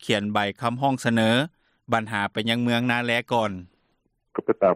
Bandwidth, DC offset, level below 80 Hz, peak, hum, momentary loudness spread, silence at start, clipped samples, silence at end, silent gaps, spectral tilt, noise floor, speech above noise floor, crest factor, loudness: 14.5 kHz; under 0.1%; -64 dBFS; -6 dBFS; none; 8 LU; 0 s; under 0.1%; 0 s; none; -5.5 dB/octave; -71 dBFS; 47 dB; 18 dB; -24 LUFS